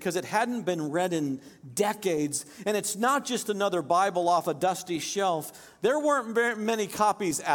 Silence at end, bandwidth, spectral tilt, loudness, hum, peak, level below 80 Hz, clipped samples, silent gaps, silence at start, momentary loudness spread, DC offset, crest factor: 0 s; 17.5 kHz; -3.5 dB/octave; -27 LUFS; none; -10 dBFS; -72 dBFS; under 0.1%; none; 0 s; 6 LU; under 0.1%; 18 dB